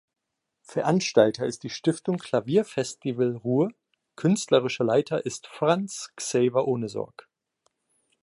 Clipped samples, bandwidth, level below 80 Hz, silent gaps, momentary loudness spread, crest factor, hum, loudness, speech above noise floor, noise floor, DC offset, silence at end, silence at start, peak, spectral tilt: under 0.1%; 11.5 kHz; -70 dBFS; none; 10 LU; 22 dB; none; -26 LUFS; 49 dB; -73 dBFS; under 0.1%; 1.15 s; 0.7 s; -4 dBFS; -5.5 dB/octave